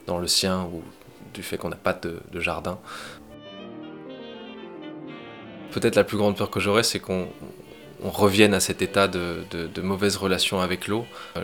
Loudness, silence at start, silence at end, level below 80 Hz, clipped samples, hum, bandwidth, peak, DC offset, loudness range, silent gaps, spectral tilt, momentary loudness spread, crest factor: -24 LUFS; 0 s; 0 s; -58 dBFS; under 0.1%; none; 19.5 kHz; -2 dBFS; 0.1%; 11 LU; none; -4 dB/octave; 20 LU; 24 dB